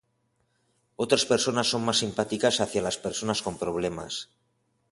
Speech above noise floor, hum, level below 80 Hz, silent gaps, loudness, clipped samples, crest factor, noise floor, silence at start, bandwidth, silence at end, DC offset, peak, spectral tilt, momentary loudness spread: 46 dB; none; -58 dBFS; none; -27 LUFS; under 0.1%; 22 dB; -73 dBFS; 1 s; 11.5 kHz; 0.65 s; under 0.1%; -6 dBFS; -3 dB/octave; 11 LU